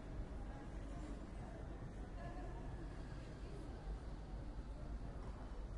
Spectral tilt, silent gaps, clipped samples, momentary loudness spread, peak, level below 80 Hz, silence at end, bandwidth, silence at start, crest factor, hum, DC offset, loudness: -7 dB/octave; none; under 0.1%; 1 LU; -36 dBFS; -50 dBFS; 0 s; 11 kHz; 0 s; 12 dB; none; under 0.1%; -52 LUFS